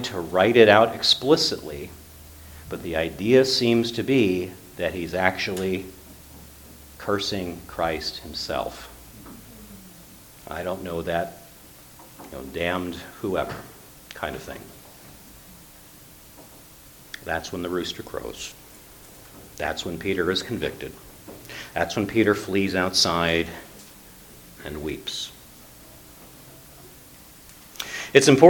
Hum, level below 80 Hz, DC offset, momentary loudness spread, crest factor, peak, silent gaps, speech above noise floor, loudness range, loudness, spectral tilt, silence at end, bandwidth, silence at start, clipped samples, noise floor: none; -50 dBFS; under 0.1%; 26 LU; 26 dB; 0 dBFS; none; 25 dB; 14 LU; -24 LUFS; -4 dB/octave; 0 s; 19 kHz; 0 s; under 0.1%; -48 dBFS